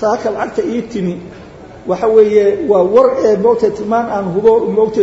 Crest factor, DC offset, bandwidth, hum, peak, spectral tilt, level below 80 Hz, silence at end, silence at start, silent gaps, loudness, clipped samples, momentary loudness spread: 12 dB; under 0.1%; 7.8 kHz; none; 0 dBFS; -7 dB/octave; -46 dBFS; 0 s; 0 s; none; -13 LUFS; under 0.1%; 11 LU